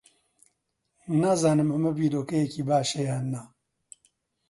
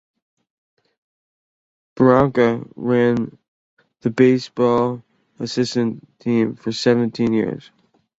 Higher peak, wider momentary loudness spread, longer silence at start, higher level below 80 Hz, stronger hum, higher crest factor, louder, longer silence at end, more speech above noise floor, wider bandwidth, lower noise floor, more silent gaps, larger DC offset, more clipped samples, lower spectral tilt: second, -10 dBFS vs -2 dBFS; about the same, 10 LU vs 12 LU; second, 1.05 s vs 1.95 s; second, -68 dBFS vs -54 dBFS; neither; about the same, 18 dB vs 18 dB; second, -26 LUFS vs -19 LUFS; first, 1.05 s vs 0.6 s; second, 52 dB vs over 72 dB; first, 11.5 kHz vs 8 kHz; second, -77 dBFS vs under -90 dBFS; second, none vs 3.48-3.77 s; neither; neither; about the same, -6 dB/octave vs -6.5 dB/octave